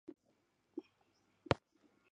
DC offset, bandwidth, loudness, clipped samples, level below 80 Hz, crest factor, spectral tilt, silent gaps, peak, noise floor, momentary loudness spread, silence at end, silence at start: under 0.1%; 8.8 kHz; -43 LUFS; under 0.1%; -64 dBFS; 34 dB; -6.5 dB/octave; none; -14 dBFS; -78 dBFS; 20 LU; 0.55 s; 0.75 s